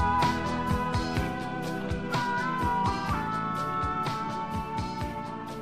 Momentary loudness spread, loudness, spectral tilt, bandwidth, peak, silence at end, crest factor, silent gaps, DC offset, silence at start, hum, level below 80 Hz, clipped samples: 6 LU; -30 LUFS; -6 dB/octave; 15.5 kHz; -14 dBFS; 0 s; 16 dB; none; 0.3%; 0 s; none; -42 dBFS; under 0.1%